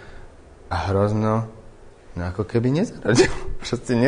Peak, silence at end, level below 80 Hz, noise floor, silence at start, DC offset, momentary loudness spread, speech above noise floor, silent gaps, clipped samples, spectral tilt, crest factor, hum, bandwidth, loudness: -2 dBFS; 0 s; -38 dBFS; -44 dBFS; 0 s; under 0.1%; 13 LU; 23 dB; none; under 0.1%; -6 dB/octave; 20 dB; none; 10 kHz; -22 LUFS